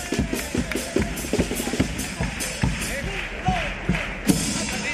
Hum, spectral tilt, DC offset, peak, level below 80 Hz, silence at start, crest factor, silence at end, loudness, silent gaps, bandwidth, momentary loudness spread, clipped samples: none; -4 dB/octave; under 0.1%; -4 dBFS; -34 dBFS; 0 s; 20 dB; 0 s; -25 LUFS; none; 15.5 kHz; 4 LU; under 0.1%